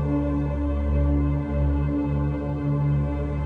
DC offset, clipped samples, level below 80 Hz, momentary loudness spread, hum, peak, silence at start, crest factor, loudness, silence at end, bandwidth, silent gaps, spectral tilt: under 0.1%; under 0.1%; -28 dBFS; 3 LU; none; -14 dBFS; 0 s; 10 dB; -25 LUFS; 0 s; 3.8 kHz; none; -11 dB/octave